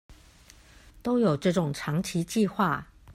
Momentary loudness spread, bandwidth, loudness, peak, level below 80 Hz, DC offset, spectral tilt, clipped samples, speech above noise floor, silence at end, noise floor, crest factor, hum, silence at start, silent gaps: 6 LU; 15.5 kHz; -27 LUFS; -12 dBFS; -56 dBFS; under 0.1%; -6 dB/octave; under 0.1%; 28 dB; 0 s; -54 dBFS; 16 dB; none; 0.1 s; none